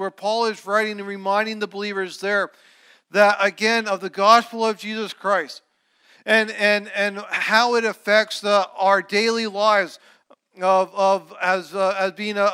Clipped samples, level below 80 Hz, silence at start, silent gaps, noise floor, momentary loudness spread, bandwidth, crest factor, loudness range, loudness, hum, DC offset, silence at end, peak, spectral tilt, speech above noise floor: under 0.1%; -84 dBFS; 0 s; none; -58 dBFS; 9 LU; 15.5 kHz; 20 dB; 2 LU; -20 LUFS; none; under 0.1%; 0 s; -2 dBFS; -3 dB/octave; 38 dB